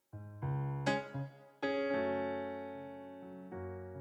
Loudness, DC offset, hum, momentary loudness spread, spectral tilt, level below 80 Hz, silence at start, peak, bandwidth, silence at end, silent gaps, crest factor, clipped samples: -39 LUFS; under 0.1%; none; 14 LU; -7 dB/octave; -68 dBFS; 0.15 s; -20 dBFS; 9.8 kHz; 0 s; none; 18 dB; under 0.1%